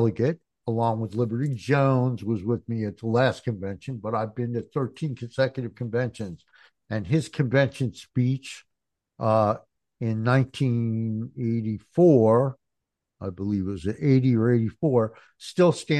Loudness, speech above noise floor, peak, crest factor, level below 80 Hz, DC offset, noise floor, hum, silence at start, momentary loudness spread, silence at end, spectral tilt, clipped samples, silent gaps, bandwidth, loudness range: -25 LUFS; 59 dB; -6 dBFS; 18 dB; -62 dBFS; under 0.1%; -83 dBFS; none; 0 s; 12 LU; 0 s; -8 dB/octave; under 0.1%; none; 10 kHz; 5 LU